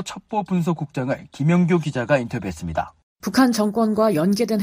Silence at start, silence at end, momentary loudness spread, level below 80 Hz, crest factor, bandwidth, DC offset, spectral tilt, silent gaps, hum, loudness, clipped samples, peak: 0 s; 0 s; 10 LU; -50 dBFS; 16 dB; 15.5 kHz; under 0.1%; -6.5 dB/octave; 3.03-3.16 s; none; -21 LUFS; under 0.1%; -4 dBFS